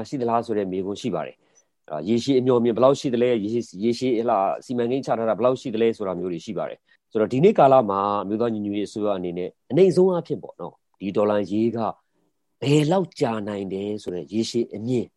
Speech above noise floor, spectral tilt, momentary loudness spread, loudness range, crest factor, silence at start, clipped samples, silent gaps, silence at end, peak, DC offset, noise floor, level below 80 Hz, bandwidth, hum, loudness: 50 dB; -7 dB/octave; 12 LU; 3 LU; 20 dB; 0 s; under 0.1%; none; 0.1 s; -2 dBFS; under 0.1%; -72 dBFS; -66 dBFS; 11.5 kHz; none; -23 LUFS